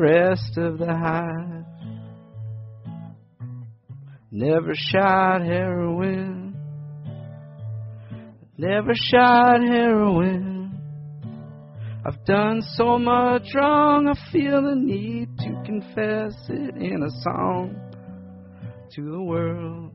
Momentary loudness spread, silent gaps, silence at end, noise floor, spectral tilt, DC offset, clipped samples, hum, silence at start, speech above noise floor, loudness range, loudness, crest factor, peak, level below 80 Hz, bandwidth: 22 LU; none; 0 s; -42 dBFS; -5 dB/octave; under 0.1%; under 0.1%; none; 0 s; 22 dB; 10 LU; -21 LUFS; 18 dB; -6 dBFS; -54 dBFS; 5.8 kHz